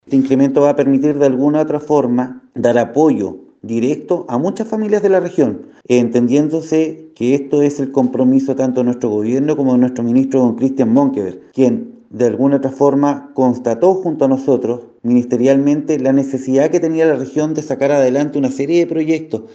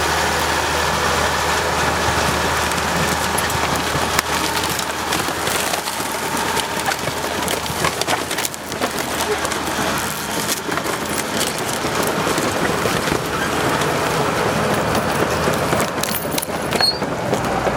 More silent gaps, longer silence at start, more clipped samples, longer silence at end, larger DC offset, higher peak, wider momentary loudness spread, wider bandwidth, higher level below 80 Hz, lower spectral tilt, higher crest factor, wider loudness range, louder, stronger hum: neither; about the same, 0.1 s vs 0 s; neither; about the same, 0 s vs 0 s; neither; about the same, 0 dBFS vs 0 dBFS; about the same, 6 LU vs 4 LU; second, 8 kHz vs 19 kHz; second, -62 dBFS vs -40 dBFS; first, -7.5 dB/octave vs -3 dB/octave; second, 14 dB vs 20 dB; about the same, 2 LU vs 3 LU; first, -15 LUFS vs -19 LUFS; neither